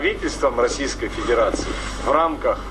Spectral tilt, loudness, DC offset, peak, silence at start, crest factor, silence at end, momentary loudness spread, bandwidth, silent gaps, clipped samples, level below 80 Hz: -4 dB/octave; -21 LUFS; under 0.1%; -6 dBFS; 0 s; 16 dB; 0 s; 7 LU; 12.5 kHz; none; under 0.1%; -34 dBFS